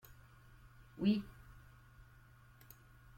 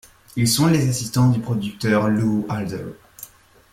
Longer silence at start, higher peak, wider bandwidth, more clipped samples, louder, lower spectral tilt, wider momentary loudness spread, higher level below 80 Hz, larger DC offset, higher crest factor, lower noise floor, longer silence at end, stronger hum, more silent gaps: first, 0.95 s vs 0.35 s; second, -22 dBFS vs -6 dBFS; about the same, 16.5 kHz vs 16.5 kHz; neither; second, -37 LUFS vs -20 LUFS; first, -7.5 dB/octave vs -5.5 dB/octave; first, 27 LU vs 21 LU; second, -64 dBFS vs -50 dBFS; neither; first, 22 dB vs 14 dB; first, -62 dBFS vs -44 dBFS; first, 1.6 s vs 0.45 s; neither; neither